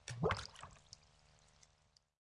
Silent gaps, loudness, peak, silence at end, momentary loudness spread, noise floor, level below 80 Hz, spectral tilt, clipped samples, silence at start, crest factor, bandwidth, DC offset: none; -42 LUFS; -20 dBFS; 1.4 s; 21 LU; -74 dBFS; -64 dBFS; -5 dB/octave; under 0.1%; 0.05 s; 26 dB; 11.5 kHz; under 0.1%